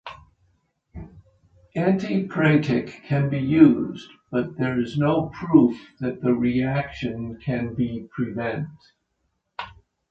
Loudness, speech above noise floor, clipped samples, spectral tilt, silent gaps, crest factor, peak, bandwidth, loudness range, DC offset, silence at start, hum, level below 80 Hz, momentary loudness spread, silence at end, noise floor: -23 LUFS; 52 dB; under 0.1%; -8.5 dB/octave; none; 22 dB; -2 dBFS; 7.6 kHz; 6 LU; under 0.1%; 0.05 s; none; -52 dBFS; 19 LU; 0.4 s; -74 dBFS